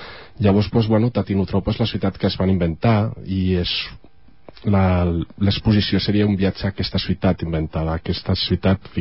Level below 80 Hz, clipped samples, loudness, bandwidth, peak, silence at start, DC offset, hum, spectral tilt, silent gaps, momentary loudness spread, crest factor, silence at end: -34 dBFS; under 0.1%; -20 LUFS; 5.8 kHz; -4 dBFS; 0 s; 0.6%; none; -11 dB/octave; none; 6 LU; 14 dB; 0 s